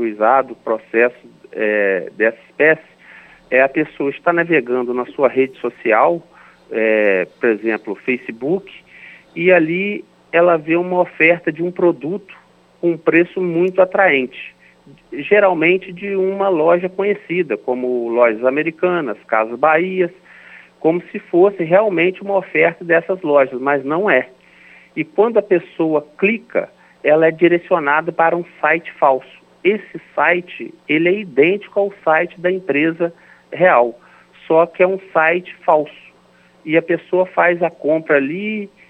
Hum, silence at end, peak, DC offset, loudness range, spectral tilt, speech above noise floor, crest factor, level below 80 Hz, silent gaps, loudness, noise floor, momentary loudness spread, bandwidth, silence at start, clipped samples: none; 0.2 s; 0 dBFS; under 0.1%; 2 LU; -8.5 dB/octave; 35 dB; 16 dB; -68 dBFS; none; -16 LUFS; -51 dBFS; 9 LU; 4.5 kHz; 0 s; under 0.1%